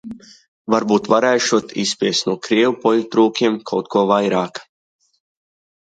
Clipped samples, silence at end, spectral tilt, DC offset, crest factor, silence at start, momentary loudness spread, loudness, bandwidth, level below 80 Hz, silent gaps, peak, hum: under 0.1%; 1.35 s; -4 dB/octave; under 0.1%; 18 dB; 0.05 s; 11 LU; -17 LUFS; 9.2 kHz; -64 dBFS; 0.48-0.65 s; -2 dBFS; none